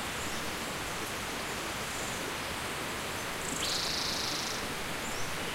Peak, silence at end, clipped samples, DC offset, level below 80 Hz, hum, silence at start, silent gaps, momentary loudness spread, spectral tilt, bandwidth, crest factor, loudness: -20 dBFS; 0 s; under 0.1%; under 0.1%; -52 dBFS; none; 0 s; none; 5 LU; -2 dB/octave; 16 kHz; 16 dB; -34 LUFS